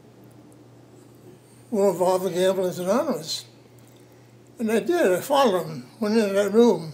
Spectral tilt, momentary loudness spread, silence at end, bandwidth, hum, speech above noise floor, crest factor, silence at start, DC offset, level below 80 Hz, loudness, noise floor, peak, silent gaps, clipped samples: -5 dB/octave; 11 LU; 0 s; 16 kHz; none; 29 dB; 18 dB; 1.25 s; under 0.1%; -74 dBFS; -22 LUFS; -50 dBFS; -6 dBFS; none; under 0.1%